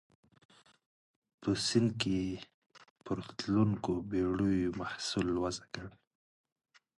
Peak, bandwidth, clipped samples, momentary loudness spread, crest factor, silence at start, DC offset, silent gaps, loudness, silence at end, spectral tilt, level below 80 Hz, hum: -14 dBFS; 11.5 kHz; under 0.1%; 15 LU; 22 dB; 1.4 s; under 0.1%; 2.54-2.70 s, 2.90-2.96 s; -34 LUFS; 1.05 s; -5.5 dB/octave; -58 dBFS; none